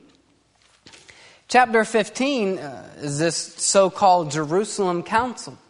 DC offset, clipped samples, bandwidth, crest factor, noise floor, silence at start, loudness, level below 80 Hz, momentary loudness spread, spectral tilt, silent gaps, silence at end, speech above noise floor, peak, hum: under 0.1%; under 0.1%; 11 kHz; 20 dB; -60 dBFS; 1.5 s; -21 LUFS; -60 dBFS; 12 LU; -3.5 dB/octave; none; 0.15 s; 39 dB; -2 dBFS; none